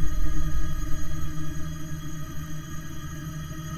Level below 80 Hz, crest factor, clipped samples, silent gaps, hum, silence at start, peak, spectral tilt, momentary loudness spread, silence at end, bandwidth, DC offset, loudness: -30 dBFS; 12 dB; under 0.1%; none; none; 0 s; -8 dBFS; -5.5 dB/octave; 6 LU; 0 s; 14 kHz; under 0.1%; -35 LUFS